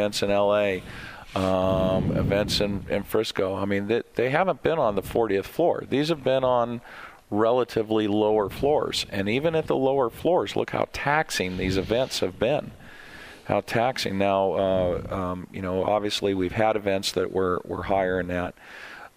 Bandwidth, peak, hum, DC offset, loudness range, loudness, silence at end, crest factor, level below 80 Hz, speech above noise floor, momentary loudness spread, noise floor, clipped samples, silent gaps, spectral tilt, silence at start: 15.5 kHz; -4 dBFS; none; under 0.1%; 2 LU; -25 LUFS; 0.1 s; 20 dB; -46 dBFS; 20 dB; 9 LU; -44 dBFS; under 0.1%; none; -5.5 dB/octave; 0 s